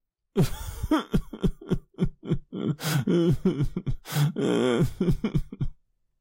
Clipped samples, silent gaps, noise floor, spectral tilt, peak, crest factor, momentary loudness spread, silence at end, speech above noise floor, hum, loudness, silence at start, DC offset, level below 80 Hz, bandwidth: under 0.1%; none; -52 dBFS; -6.5 dB/octave; -12 dBFS; 16 dB; 9 LU; 0.5 s; 27 dB; none; -27 LUFS; 0.35 s; under 0.1%; -36 dBFS; 16 kHz